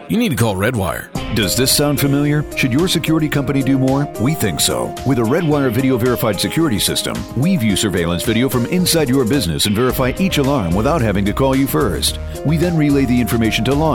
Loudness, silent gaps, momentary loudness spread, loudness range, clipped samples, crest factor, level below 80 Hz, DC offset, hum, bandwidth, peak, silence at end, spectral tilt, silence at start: -16 LUFS; none; 4 LU; 1 LU; under 0.1%; 14 dB; -32 dBFS; under 0.1%; none; 19 kHz; -2 dBFS; 0 s; -5 dB/octave; 0 s